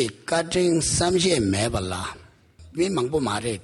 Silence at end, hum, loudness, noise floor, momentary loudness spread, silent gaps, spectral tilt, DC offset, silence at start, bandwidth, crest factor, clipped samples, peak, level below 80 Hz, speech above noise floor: 0 s; none; -23 LUFS; -49 dBFS; 10 LU; none; -4 dB/octave; under 0.1%; 0 s; 12 kHz; 16 dB; under 0.1%; -8 dBFS; -46 dBFS; 26 dB